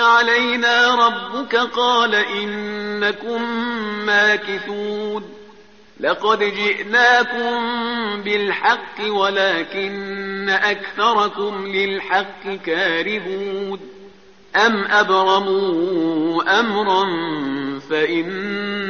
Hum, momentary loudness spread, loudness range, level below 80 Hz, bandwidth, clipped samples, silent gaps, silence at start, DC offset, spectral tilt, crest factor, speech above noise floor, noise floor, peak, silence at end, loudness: none; 11 LU; 3 LU; -62 dBFS; 6.8 kHz; under 0.1%; none; 0 s; 0.3%; -1 dB/octave; 16 dB; 28 dB; -47 dBFS; -2 dBFS; 0 s; -18 LUFS